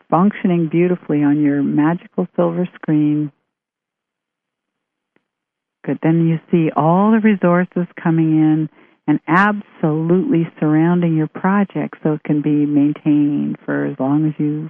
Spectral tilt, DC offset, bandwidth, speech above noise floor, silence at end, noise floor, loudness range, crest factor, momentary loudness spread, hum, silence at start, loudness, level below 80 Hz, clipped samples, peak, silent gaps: -11 dB/octave; under 0.1%; 3.6 kHz; 67 dB; 0 s; -83 dBFS; 7 LU; 16 dB; 7 LU; none; 0.1 s; -17 LUFS; -66 dBFS; under 0.1%; 0 dBFS; none